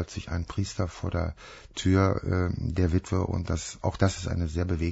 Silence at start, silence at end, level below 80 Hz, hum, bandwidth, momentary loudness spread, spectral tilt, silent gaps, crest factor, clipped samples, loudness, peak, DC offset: 0 s; 0 s; -40 dBFS; none; 8 kHz; 9 LU; -6.5 dB/octave; none; 18 dB; under 0.1%; -29 LUFS; -10 dBFS; under 0.1%